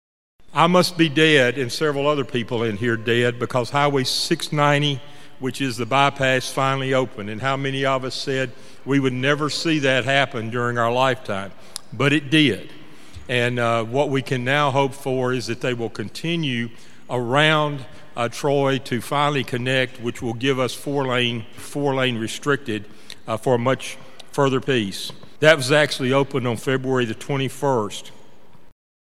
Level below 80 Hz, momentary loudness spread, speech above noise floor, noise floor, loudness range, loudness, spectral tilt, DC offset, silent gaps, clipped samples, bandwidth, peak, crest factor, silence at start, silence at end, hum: -60 dBFS; 12 LU; 31 dB; -51 dBFS; 3 LU; -21 LUFS; -5 dB/octave; 2%; none; under 0.1%; 15 kHz; 0 dBFS; 22 dB; 0.4 s; 0.4 s; none